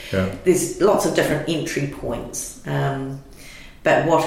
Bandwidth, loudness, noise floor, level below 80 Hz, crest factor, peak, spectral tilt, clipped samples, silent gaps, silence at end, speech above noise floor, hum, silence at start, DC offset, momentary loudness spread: 16.5 kHz; -21 LUFS; -40 dBFS; -44 dBFS; 16 dB; -4 dBFS; -5 dB/octave; under 0.1%; none; 0 s; 20 dB; none; 0 s; under 0.1%; 15 LU